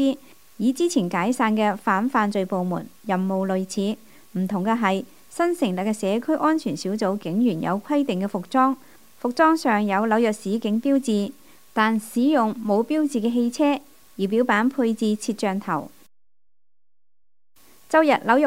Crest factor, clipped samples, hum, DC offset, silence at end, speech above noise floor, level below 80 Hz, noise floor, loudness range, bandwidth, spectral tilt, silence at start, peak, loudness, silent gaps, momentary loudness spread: 20 dB; under 0.1%; none; 0.3%; 0 s; over 68 dB; -70 dBFS; under -90 dBFS; 3 LU; 16 kHz; -5.5 dB/octave; 0 s; -4 dBFS; -23 LUFS; none; 9 LU